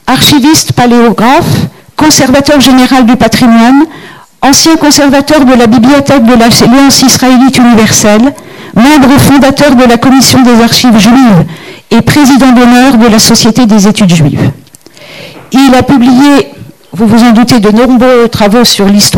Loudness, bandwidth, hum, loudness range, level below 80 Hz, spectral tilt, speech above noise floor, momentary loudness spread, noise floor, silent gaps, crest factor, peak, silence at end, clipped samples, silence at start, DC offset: -3 LUFS; over 20 kHz; none; 3 LU; -30 dBFS; -4 dB/octave; 30 dB; 6 LU; -32 dBFS; none; 4 dB; 0 dBFS; 0 s; 2%; 0.05 s; under 0.1%